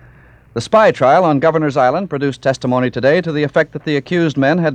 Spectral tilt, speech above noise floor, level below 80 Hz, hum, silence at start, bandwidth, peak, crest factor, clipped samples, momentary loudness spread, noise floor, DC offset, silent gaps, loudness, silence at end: -6.5 dB/octave; 30 dB; -52 dBFS; none; 0.55 s; 9.6 kHz; 0 dBFS; 14 dB; under 0.1%; 7 LU; -44 dBFS; under 0.1%; none; -14 LUFS; 0 s